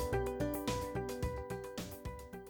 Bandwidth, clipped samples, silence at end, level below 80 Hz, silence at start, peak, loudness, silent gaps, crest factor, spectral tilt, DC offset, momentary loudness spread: over 20 kHz; under 0.1%; 0 s; -48 dBFS; 0 s; -24 dBFS; -40 LUFS; none; 14 dB; -5.5 dB/octave; under 0.1%; 9 LU